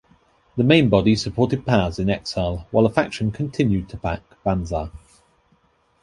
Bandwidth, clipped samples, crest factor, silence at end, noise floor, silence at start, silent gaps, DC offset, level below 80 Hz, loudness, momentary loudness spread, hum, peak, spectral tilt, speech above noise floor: 11 kHz; under 0.1%; 20 dB; 1.05 s; -61 dBFS; 0.55 s; none; under 0.1%; -40 dBFS; -21 LUFS; 12 LU; none; -2 dBFS; -6.5 dB/octave; 41 dB